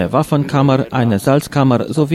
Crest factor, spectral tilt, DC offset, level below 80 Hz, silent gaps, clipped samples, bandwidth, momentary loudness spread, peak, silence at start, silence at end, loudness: 12 dB; -7 dB/octave; under 0.1%; -46 dBFS; none; under 0.1%; 15 kHz; 2 LU; -2 dBFS; 0 s; 0 s; -15 LUFS